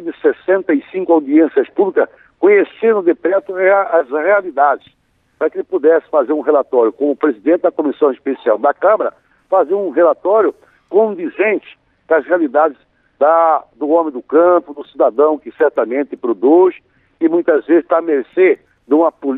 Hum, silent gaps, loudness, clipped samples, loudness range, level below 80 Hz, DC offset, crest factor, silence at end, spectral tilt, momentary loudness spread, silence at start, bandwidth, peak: none; none; -14 LUFS; under 0.1%; 2 LU; -66 dBFS; under 0.1%; 12 dB; 0 s; -9 dB/octave; 6 LU; 0 s; 4 kHz; -2 dBFS